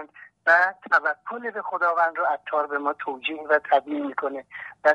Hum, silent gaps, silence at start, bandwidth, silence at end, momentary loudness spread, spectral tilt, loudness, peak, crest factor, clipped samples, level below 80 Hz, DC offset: none; none; 0 s; 9.6 kHz; 0 s; 12 LU; -4 dB/octave; -24 LUFS; -6 dBFS; 18 dB; under 0.1%; -78 dBFS; under 0.1%